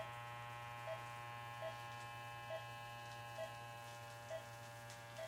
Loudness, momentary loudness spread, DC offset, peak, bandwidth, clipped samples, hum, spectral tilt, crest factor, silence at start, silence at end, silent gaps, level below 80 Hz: -51 LUFS; 4 LU; under 0.1%; -36 dBFS; 16 kHz; under 0.1%; 60 Hz at -75 dBFS; -3.5 dB/octave; 14 dB; 0 s; 0 s; none; -76 dBFS